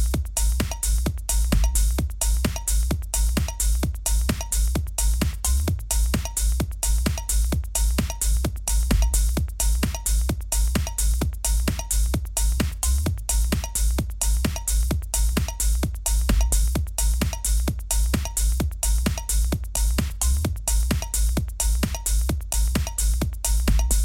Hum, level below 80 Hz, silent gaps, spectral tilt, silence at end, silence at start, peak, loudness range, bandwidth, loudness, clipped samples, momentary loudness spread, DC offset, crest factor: none; -24 dBFS; none; -4 dB/octave; 0 s; 0 s; -8 dBFS; 1 LU; 17 kHz; -24 LUFS; under 0.1%; 2 LU; under 0.1%; 14 dB